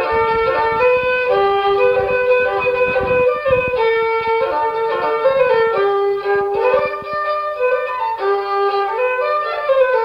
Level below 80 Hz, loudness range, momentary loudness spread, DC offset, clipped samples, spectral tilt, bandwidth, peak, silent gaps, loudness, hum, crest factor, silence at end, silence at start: -46 dBFS; 3 LU; 4 LU; under 0.1%; under 0.1%; -6 dB/octave; 5.8 kHz; -4 dBFS; none; -16 LUFS; none; 12 dB; 0 s; 0 s